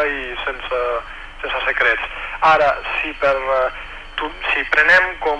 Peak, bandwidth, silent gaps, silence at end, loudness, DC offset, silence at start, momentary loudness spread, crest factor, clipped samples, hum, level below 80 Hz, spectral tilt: -2 dBFS; 10.5 kHz; none; 0 s; -17 LUFS; under 0.1%; 0 s; 13 LU; 16 dB; under 0.1%; none; -38 dBFS; -3.5 dB/octave